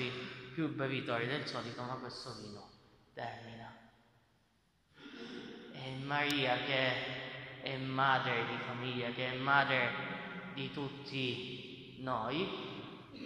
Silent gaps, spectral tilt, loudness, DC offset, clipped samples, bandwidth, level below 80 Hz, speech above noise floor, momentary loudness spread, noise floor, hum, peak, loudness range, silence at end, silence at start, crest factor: none; -5.5 dB/octave; -37 LUFS; under 0.1%; under 0.1%; 14.5 kHz; -72 dBFS; 37 dB; 18 LU; -74 dBFS; none; -14 dBFS; 15 LU; 0 s; 0 s; 24 dB